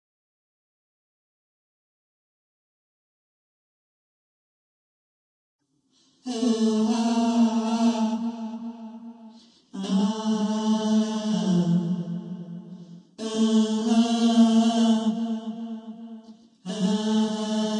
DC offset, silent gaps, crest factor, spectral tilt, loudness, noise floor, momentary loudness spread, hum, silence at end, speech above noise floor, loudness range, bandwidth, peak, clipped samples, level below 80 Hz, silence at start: under 0.1%; none; 18 dB; -6 dB/octave; -24 LUFS; -66 dBFS; 20 LU; none; 0 s; 43 dB; 5 LU; 10 kHz; -8 dBFS; under 0.1%; -74 dBFS; 6.25 s